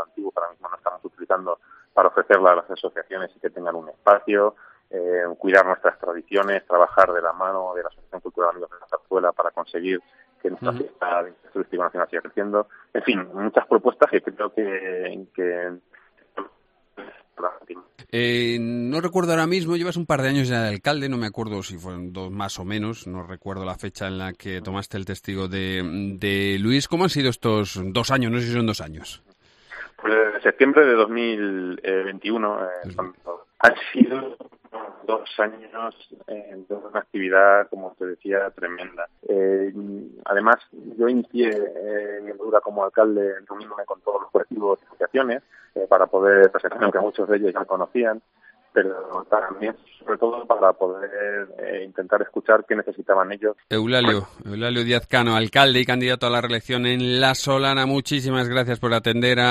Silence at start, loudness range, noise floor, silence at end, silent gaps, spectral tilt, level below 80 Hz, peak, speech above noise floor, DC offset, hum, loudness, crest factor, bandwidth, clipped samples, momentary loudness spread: 0 s; 7 LU; -60 dBFS; 0 s; none; -5.5 dB/octave; -58 dBFS; 0 dBFS; 38 dB; under 0.1%; none; -22 LUFS; 22 dB; 13 kHz; under 0.1%; 16 LU